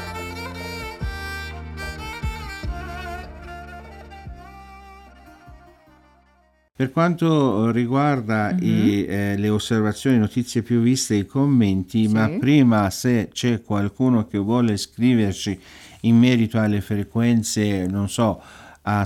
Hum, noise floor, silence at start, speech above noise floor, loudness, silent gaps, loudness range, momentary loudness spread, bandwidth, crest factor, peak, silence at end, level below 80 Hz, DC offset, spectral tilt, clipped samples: none; -59 dBFS; 0 s; 40 dB; -21 LUFS; none; 14 LU; 16 LU; 15 kHz; 16 dB; -6 dBFS; 0 s; -42 dBFS; under 0.1%; -6 dB/octave; under 0.1%